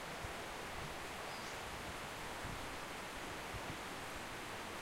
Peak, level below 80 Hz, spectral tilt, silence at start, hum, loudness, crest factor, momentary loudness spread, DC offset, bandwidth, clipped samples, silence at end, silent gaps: -32 dBFS; -60 dBFS; -3 dB/octave; 0 s; none; -46 LUFS; 14 dB; 1 LU; under 0.1%; 16 kHz; under 0.1%; 0 s; none